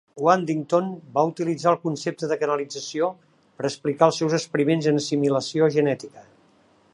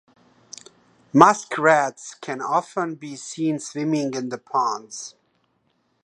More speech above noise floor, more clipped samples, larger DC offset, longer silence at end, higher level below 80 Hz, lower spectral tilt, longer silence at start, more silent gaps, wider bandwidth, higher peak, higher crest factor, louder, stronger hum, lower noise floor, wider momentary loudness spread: second, 36 dB vs 46 dB; neither; neither; second, 0.7 s vs 0.95 s; about the same, -72 dBFS vs -70 dBFS; about the same, -5.5 dB/octave vs -4.5 dB/octave; second, 0.15 s vs 1.15 s; neither; about the same, 11.5 kHz vs 11 kHz; about the same, -2 dBFS vs 0 dBFS; about the same, 20 dB vs 24 dB; about the same, -23 LUFS vs -21 LUFS; neither; second, -59 dBFS vs -68 dBFS; second, 8 LU vs 22 LU